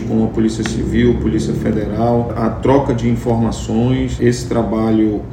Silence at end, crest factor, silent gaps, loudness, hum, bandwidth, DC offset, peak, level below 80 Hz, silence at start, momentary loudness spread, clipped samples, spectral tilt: 0 s; 16 dB; none; -16 LUFS; none; 10.5 kHz; under 0.1%; 0 dBFS; -30 dBFS; 0 s; 4 LU; under 0.1%; -7 dB/octave